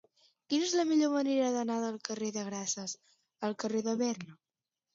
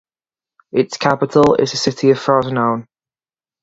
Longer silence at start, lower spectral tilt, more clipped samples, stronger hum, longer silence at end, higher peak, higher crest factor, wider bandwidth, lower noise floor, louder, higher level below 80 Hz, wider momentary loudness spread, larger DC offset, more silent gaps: second, 0.5 s vs 0.75 s; second, -3.5 dB/octave vs -5.5 dB/octave; neither; neither; second, 0.6 s vs 0.8 s; second, -18 dBFS vs 0 dBFS; about the same, 16 dB vs 18 dB; about the same, 7.8 kHz vs 8 kHz; about the same, under -90 dBFS vs under -90 dBFS; second, -33 LUFS vs -16 LUFS; second, -84 dBFS vs -52 dBFS; first, 11 LU vs 7 LU; neither; neither